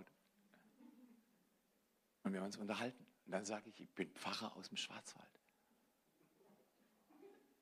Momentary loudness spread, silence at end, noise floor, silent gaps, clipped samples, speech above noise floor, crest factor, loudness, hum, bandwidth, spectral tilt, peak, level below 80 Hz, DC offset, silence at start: 21 LU; 0.25 s; -81 dBFS; none; under 0.1%; 33 dB; 24 dB; -48 LUFS; none; 15 kHz; -4 dB/octave; -28 dBFS; under -90 dBFS; under 0.1%; 0 s